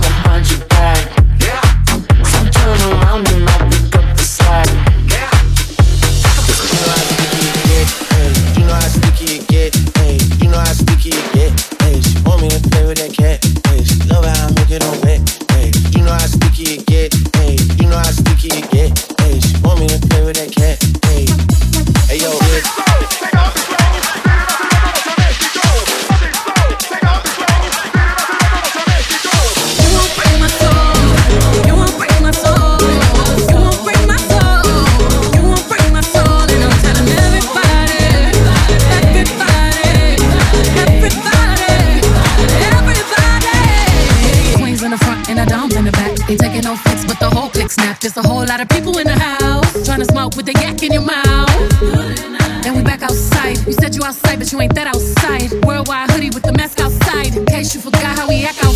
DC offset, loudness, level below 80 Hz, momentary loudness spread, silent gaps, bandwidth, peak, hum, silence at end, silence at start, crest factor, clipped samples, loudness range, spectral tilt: under 0.1%; -12 LUFS; -14 dBFS; 4 LU; none; 16 kHz; 0 dBFS; none; 0 s; 0 s; 10 dB; under 0.1%; 3 LU; -4.5 dB/octave